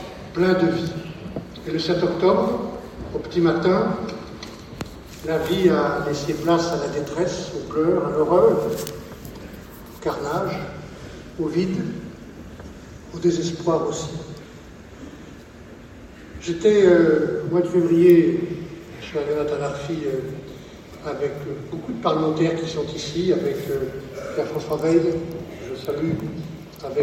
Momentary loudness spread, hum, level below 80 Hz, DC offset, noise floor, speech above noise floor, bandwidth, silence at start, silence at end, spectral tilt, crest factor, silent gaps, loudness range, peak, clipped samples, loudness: 21 LU; none; -48 dBFS; under 0.1%; -42 dBFS; 21 dB; 16.5 kHz; 0 s; 0 s; -6.5 dB/octave; 20 dB; none; 9 LU; -4 dBFS; under 0.1%; -22 LUFS